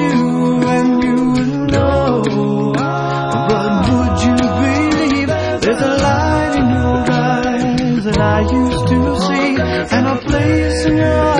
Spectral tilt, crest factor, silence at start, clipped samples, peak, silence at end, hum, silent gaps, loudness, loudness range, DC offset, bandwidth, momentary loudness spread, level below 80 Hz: -6.5 dB/octave; 12 dB; 0 s; under 0.1%; -2 dBFS; 0 s; none; none; -14 LUFS; 1 LU; under 0.1%; 10.5 kHz; 2 LU; -30 dBFS